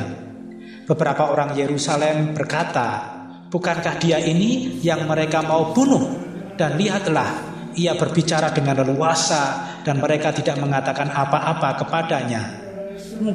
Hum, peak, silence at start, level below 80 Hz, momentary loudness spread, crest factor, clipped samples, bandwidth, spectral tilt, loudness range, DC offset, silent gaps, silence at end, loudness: none; -4 dBFS; 0 s; -58 dBFS; 13 LU; 16 dB; under 0.1%; 12 kHz; -5 dB/octave; 2 LU; under 0.1%; none; 0 s; -20 LUFS